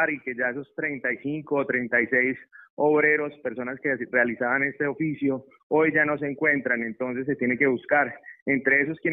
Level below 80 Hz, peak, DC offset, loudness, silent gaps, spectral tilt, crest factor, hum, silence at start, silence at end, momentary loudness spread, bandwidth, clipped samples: -68 dBFS; -8 dBFS; under 0.1%; -24 LUFS; 2.70-2.77 s, 5.63-5.70 s, 8.42-8.46 s; -10.5 dB/octave; 18 dB; none; 0 s; 0 s; 9 LU; 3.9 kHz; under 0.1%